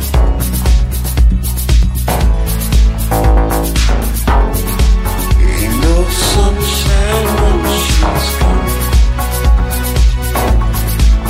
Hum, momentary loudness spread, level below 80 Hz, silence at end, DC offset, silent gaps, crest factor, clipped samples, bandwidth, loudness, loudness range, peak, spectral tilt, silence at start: none; 3 LU; -12 dBFS; 0 s; under 0.1%; none; 10 dB; under 0.1%; 16.5 kHz; -13 LUFS; 1 LU; 0 dBFS; -5 dB/octave; 0 s